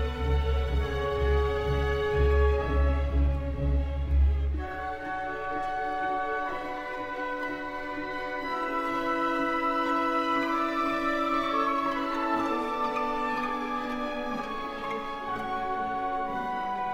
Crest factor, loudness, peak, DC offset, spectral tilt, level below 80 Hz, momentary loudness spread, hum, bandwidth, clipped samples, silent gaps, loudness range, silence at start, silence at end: 14 dB; -29 LUFS; -14 dBFS; under 0.1%; -7 dB/octave; -32 dBFS; 7 LU; none; 8 kHz; under 0.1%; none; 5 LU; 0 s; 0 s